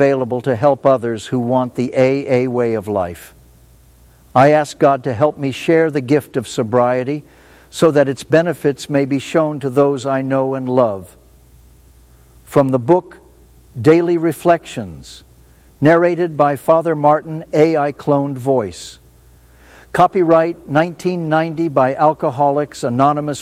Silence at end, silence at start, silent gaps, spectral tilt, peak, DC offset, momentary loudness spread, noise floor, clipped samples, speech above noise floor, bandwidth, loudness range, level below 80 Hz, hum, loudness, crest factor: 0 s; 0 s; none; -7 dB/octave; 0 dBFS; under 0.1%; 8 LU; -47 dBFS; under 0.1%; 32 dB; 15.5 kHz; 3 LU; -52 dBFS; none; -16 LUFS; 16 dB